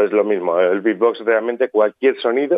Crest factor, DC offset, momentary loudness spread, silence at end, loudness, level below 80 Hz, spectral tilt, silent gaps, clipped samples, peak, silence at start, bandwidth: 14 dB; under 0.1%; 2 LU; 0 s; -17 LUFS; -76 dBFS; -8.5 dB/octave; none; under 0.1%; -4 dBFS; 0 s; 5 kHz